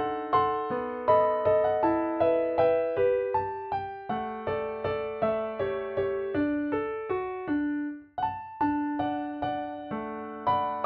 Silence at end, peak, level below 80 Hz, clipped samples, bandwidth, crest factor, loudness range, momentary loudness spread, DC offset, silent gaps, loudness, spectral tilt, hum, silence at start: 0 s; -12 dBFS; -60 dBFS; under 0.1%; 5.2 kHz; 16 dB; 5 LU; 9 LU; under 0.1%; none; -29 LUFS; -9.5 dB/octave; none; 0 s